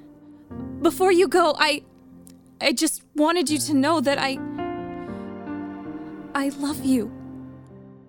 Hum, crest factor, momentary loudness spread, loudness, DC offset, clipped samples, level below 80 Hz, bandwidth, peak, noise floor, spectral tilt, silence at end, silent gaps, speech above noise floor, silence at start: none; 22 dB; 17 LU; -23 LUFS; under 0.1%; under 0.1%; -58 dBFS; over 20 kHz; -2 dBFS; -48 dBFS; -3.5 dB/octave; 0.1 s; none; 27 dB; 0 s